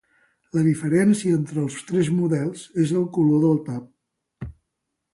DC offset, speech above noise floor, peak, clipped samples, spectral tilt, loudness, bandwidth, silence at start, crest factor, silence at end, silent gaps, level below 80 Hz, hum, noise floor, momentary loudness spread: under 0.1%; 59 dB; -8 dBFS; under 0.1%; -7.5 dB/octave; -22 LUFS; 11.5 kHz; 0.55 s; 14 dB; 0.65 s; none; -54 dBFS; none; -79 dBFS; 16 LU